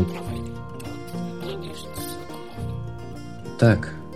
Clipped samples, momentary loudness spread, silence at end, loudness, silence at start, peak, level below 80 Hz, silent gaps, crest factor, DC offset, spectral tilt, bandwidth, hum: under 0.1%; 17 LU; 0 s; -28 LUFS; 0 s; -4 dBFS; -46 dBFS; none; 22 dB; 0.9%; -6.5 dB/octave; 16 kHz; none